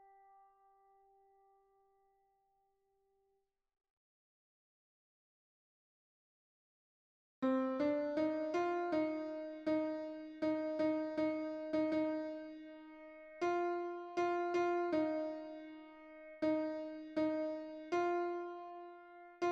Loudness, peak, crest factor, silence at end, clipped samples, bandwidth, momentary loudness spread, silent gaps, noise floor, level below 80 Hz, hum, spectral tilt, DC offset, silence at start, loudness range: -39 LUFS; -26 dBFS; 16 dB; 0 s; under 0.1%; 7.4 kHz; 18 LU; none; -82 dBFS; -80 dBFS; none; -6 dB/octave; under 0.1%; 7.4 s; 3 LU